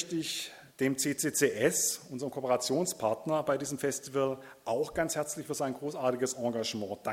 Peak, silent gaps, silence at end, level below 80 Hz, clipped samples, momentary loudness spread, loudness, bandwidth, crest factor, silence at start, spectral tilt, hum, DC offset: -12 dBFS; none; 0 s; -68 dBFS; under 0.1%; 8 LU; -32 LUFS; 17 kHz; 20 dB; 0 s; -3.5 dB/octave; none; under 0.1%